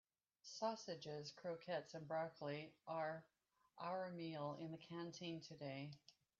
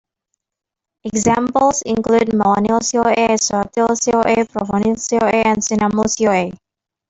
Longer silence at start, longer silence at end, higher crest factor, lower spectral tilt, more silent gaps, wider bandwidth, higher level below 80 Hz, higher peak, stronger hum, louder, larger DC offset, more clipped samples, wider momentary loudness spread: second, 0.45 s vs 1.05 s; second, 0.3 s vs 0.55 s; first, 20 dB vs 14 dB; about the same, -4.5 dB/octave vs -4 dB/octave; neither; second, 7.4 kHz vs 8.2 kHz; second, -90 dBFS vs -48 dBFS; second, -30 dBFS vs -2 dBFS; neither; second, -50 LUFS vs -16 LUFS; neither; neither; first, 7 LU vs 4 LU